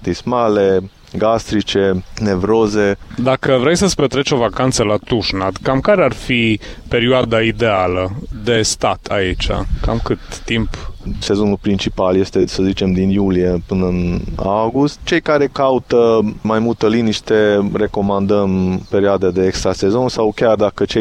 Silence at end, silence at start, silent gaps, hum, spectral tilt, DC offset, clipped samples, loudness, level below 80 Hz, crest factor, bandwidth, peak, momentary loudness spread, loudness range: 0 s; 0 s; none; none; -5.5 dB/octave; under 0.1%; under 0.1%; -16 LUFS; -32 dBFS; 12 dB; 12.5 kHz; -2 dBFS; 6 LU; 3 LU